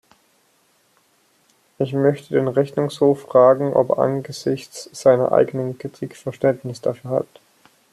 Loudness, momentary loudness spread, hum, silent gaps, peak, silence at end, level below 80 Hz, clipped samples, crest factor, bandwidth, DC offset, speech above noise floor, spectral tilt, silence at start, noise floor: -20 LUFS; 14 LU; none; none; -2 dBFS; 0.7 s; -66 dBFS; under 0.1%; 18 dB; 13 kHz; under 0.1%; 42 dB; -7 dB/octave; 1.8 s; -61 dBFS